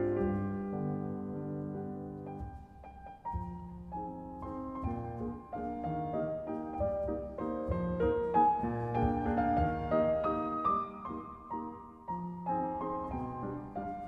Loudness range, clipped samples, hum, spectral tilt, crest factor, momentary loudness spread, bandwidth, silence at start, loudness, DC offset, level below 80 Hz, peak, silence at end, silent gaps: 11 LU; under 0.1%; none; -10 dB/octave; 18 dB; 13 LU; 6.2 kHz; 0 s; -35 LUFS; under 0.1%; -50 dBFS; -16 dBFS; 0 s; none